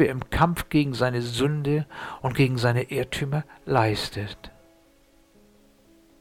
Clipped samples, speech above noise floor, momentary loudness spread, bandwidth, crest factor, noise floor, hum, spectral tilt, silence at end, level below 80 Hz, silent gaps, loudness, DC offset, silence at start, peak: under 0.1%; 34 dB; 9 LU; 16 kHz; 20 dB; -58 dBFS; none; -6 dB/octave; 1.75 s; -44 dBFS; none; -25 LUFS; under 0.1%; 0 s; -6 dBFS